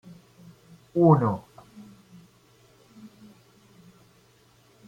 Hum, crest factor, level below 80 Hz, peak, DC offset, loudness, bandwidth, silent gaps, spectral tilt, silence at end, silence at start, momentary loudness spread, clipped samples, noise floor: none; 24 dB; -66 dBFS; -6 dBFS; under 0.1%; -22 LUFS; 7.4 kHz; none; -10 dB/octave; 3.45 s; 0.95 s; 30 LU; under 0.1%; -59 dBFS